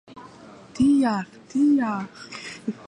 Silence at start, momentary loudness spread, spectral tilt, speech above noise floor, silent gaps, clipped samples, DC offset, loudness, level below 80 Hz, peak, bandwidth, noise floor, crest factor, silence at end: 0.1 s; 17 LU; -6 dB/octave; 24 dB; none; under 0.1%; under 0.1%; -23 LUFS; -58 dBFS; -10 dBFS; 10 kHz; -46 dBFS; 14 dB; 0.05 s